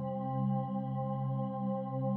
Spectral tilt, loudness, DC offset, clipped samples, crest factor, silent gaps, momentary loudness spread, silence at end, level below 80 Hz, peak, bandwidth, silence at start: -11 dB/octave; -35 LUFS; under 0.1%; under 0.1%; 10 dB; none; 3 LU; 0 s; -74 dBFS; -24 dBFS; 3.4 kHz; 0 s